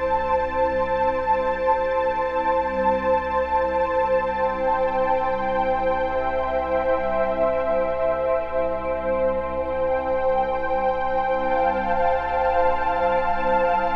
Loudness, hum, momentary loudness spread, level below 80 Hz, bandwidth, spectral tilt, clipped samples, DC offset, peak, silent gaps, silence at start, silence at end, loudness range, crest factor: -22 LUFS; none; 3 LU; -40 dBFS; 5.6 kHz; -7 dB/octave; under 0.1%; under 0.1%; -8 dBFS; none; 0 s; 0 s; 1 LU; 14 dB